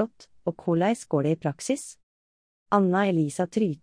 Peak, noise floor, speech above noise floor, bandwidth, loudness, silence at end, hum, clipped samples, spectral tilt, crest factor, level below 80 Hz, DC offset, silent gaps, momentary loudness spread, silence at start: -8 dBFS; under -90 dBFS; over 65 dB; 10.5 kHz; -26 LUFS; 0.05 s; none; under 0.1%; -6.5 dB/octave; 18 dB; -68 dBFS; under 0.1%; 2.03-2.66 s; 9 LU; 0 s